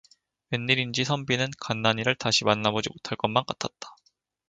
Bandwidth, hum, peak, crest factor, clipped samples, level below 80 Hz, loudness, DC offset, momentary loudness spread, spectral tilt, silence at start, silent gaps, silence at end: 9.4 kHz; none; -4 dBFS; 24 dB; under 0.1%; -62 dBFS; -26 LUFS; under 0.1%; 10 LU; -4 dB/octave; 0.5 s; none; 0.55 s